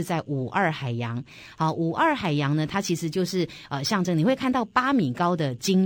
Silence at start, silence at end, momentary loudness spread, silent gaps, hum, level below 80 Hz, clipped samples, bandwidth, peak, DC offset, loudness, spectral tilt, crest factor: 0 s; 0 s; 7 LU; none; none; -60 dBFS; under 0.1%; 17 kHz; -8 dBFS; under 0.1%; -25 LUFS; -5.5 dB/octave; 18 dB